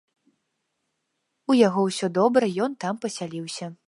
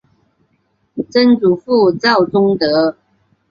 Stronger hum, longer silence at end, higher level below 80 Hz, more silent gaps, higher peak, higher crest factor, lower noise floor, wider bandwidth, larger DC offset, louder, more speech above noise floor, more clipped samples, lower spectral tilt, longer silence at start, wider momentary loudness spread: neither; second, 0.15 s vs 0.6 s; second, -78 dBFS vs -56 dBFS; neither; second, -6 dBFS vs -2 dBFS; first, 20 dB vs 14 dB; first, -77 dBFS vs -62 dBFS; first, 11.5 kHz vs 7 kHz; neither; second, -23 LUFS vs -13 LUFS; first, 54 dB vs 50 dB; neither; about the same, -5.5 dB/octave vs -6.5 dB/octave; first, 1.5 s vs 0.95 s; first, 13 LU vs 7 LU